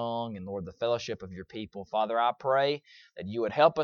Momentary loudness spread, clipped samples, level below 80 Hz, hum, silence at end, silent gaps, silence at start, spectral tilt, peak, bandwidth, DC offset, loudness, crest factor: 15 LU; under 0.1%; -66 dBFS; none; 0 s; none; 0 s; -5.5 dB/octave; -8 dBFS; 7 kHz; under 0.1%; -30 LUFS; 22 dB